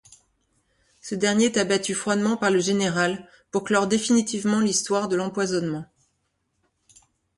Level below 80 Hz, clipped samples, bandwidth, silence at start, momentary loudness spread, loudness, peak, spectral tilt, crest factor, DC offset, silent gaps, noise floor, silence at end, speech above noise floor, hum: -64 dBFS; under 0.1%; 11.5 kHz; 1.05 s; 9 LU; -23 LUFS; -8 dBFS; -4 dB/octave; 18 dB; under 0.1%; none; -73 dBFS; 1.55 s; 51 dB; none